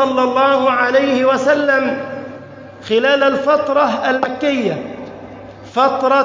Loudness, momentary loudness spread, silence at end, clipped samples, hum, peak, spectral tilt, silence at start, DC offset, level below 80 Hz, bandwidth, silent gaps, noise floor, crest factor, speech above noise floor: -15 LUFS; 19 LU; 0 s; under 0.1%; none; -2 dBFS; -5 dB/octave; 0 s; under 0.1%; -56 dBFS; 7.6 kHz; none; -35 dBFS; 14 dB; 20 dB